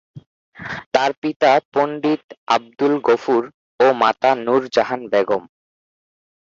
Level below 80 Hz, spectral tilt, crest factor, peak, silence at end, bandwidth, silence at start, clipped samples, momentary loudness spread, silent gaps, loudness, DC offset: -62 dBFS; -5 dB/octave; 18 dB; 0 dBFS; 1.05 s; 7.6 kHz; 0.15 s; under 0.1%; 9 LU; 0.26-0.52 s, 0.86-0.92 s, 1.17-1.22 s, 1.36-1.40 s, 1.65-1.72 s, 2.24-2.29 s, 2.37-2.47 s, 3.54-3.78 s; -18 LUFS; under 0.1%